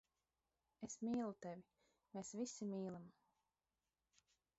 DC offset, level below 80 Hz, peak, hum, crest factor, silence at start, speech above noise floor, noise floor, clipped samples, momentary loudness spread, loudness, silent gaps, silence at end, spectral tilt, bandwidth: under 0.1%; -86 dBFS; -36 dBFS; none; 16 dB; 0.8 s; over 42 dB; under -90 dBFS; under 0.1%; 13 LU; -49 LUFS; none; 1.5 s; -7 dB/octave; 8 kHz